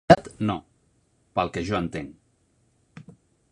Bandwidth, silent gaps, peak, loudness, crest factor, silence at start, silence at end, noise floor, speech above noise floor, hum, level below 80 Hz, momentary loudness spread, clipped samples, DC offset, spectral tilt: 11 kHz; none; -2 dBFS; -26 LUFS; 26 dB; 0.1 s; 0.5 s; -66 dBFS; 39 dB; none; -50 dBFS; 29 LU; under 0.1%; under 0.1%; -6.5 dB/octave